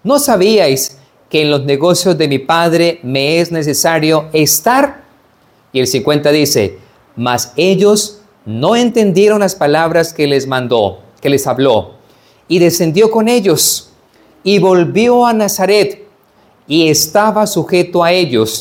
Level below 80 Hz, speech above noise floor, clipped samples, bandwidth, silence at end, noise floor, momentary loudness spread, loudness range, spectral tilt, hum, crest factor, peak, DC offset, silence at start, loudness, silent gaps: -54 dBFS; 39 dB; under 0.1%; 17.5 kHz; 0 s; -50 dBFS; 7 LU; 2 LU; -4 dB/octave; none; 12 dB; 0 dBFS; under 0.1%; 0.05 s; -11 LUFS; none